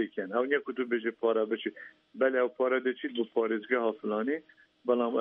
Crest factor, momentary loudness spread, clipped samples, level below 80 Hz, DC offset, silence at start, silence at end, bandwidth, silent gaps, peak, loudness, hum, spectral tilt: 16 dB; 7 LU; under 0.1%; -84 dBFS; under 0.1%; 0 s; 0 s; 3.9 kHz; none; -14 dBFS; -31 LUFS; none; -8 dB/octave